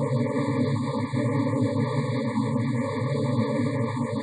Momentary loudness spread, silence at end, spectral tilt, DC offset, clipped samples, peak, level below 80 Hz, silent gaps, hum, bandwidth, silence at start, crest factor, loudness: 2 LU; 0 s; -8 dB/octave; under 0.1%; under 0.1%; -12 dBFS; -72 dBFS; none; none; 9.6 kHz; 0 s; 12 dB; -26 LUFS